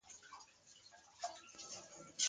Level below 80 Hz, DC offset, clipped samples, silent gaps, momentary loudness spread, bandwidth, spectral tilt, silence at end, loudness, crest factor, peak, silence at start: -86 dBFS; under 0.1%; under 0.1%; none; 12 LU; 10 kHz; 1 dB/octave; 0 s; -53 LUFS; 26 dB; -22 dBFS; 0.05 s